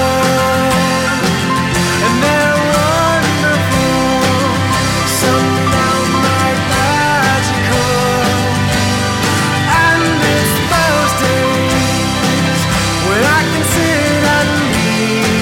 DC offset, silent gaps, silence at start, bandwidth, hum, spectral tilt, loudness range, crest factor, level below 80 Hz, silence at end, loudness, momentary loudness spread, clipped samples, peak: under 0.1%; none; 0 s; 16.5 kHz; none; -4 dB/octave; 1 LU; 12 dB; -32 dBFS; 0 s; -12 LUFS; 2 LU; under 0.1%; -2 dBFS